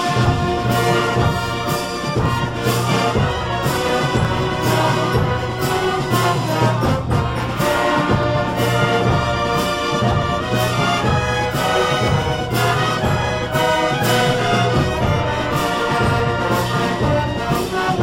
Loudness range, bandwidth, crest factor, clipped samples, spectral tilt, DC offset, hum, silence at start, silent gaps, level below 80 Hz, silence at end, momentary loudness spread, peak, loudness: 1 LU; 16.5 kHz; 14 dB; under 0.1%; -5.5 dB/octave; under 0.1%; none; 0 s; none; -34 dBFS; 0 s; 3 LU; -4 dBFS; -18 LUFS